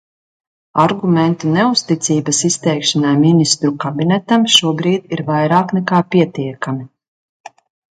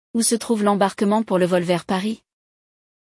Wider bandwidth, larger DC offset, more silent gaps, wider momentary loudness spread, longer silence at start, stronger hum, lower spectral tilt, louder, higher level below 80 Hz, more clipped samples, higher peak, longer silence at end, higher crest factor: about the same, 11.5 kHz vs 12 kHz; neither; first, 7.08-7.44 s vs none; first, 8 LU vs 5 LU; first, 0.75 s vs 0.15 s; neither; about the same, -4.5 dB/octave vs -4.5 dB/octave; first, -14 LUFS vs -20 LUFS; about the same, -60 dBFS vs -64 dBFS; neither; first, 0 dBFS vs -6 dBFS; second, 0.45 s vs 0.85 s; about the same, 16 dB vs 16 dB